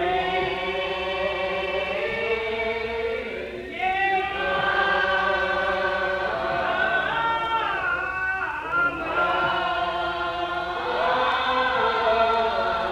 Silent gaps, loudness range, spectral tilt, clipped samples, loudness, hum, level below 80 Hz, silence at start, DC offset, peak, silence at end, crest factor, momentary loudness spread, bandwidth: none; 3 LU; -4.5 dB/octave; under 0.1%; -24 LUFS; none; -48 dBFS; 0 s; under 0.1%; -10 dBFS; 0 s; 14 dB; 6 LU; 13.5 kHz